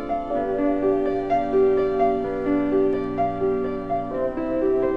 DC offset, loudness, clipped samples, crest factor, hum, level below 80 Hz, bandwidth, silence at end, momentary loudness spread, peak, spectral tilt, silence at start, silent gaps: 0.7%; -23 LUFS; under 0.1%; 12 dB; none; -42 dBFS; 5 kHz; 0 s; 6 LU; -10 dBFS; -9 dB/octave; 0 s; none